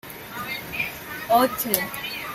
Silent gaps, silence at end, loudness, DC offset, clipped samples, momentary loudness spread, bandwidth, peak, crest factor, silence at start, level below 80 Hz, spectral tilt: none; 0 s; -24 LUFS; under 0.1%; under 0.1%; 13 LU; 16.5 kHz; 0 dBFS; 24 dB; 0.05 s; -56 dBFS; -3 dB/octave